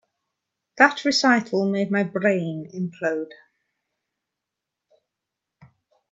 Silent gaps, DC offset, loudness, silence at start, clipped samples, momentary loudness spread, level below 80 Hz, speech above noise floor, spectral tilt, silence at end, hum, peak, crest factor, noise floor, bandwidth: none; under 0.1%; -22 LUFS; 0.75 s; under 0.1%; 13 LU; -74 dBFS; 63 dB; -4.5 dB/octave; 2.8 s; none; 0 dBFS; 26 dB; -85 dBFS; 8 kHz